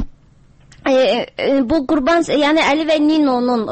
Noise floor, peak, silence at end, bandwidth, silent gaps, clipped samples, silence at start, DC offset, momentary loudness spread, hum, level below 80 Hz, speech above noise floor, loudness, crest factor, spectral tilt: -48 dBFS; -4 dBFS; 0 s; 8.8 kHz; none; under 0.1%; 0 s; under 0.1%; 4 LU; none; -40 dBFS; 33 dB; -15 LUFS; 12 dB; -4.5 dB/octave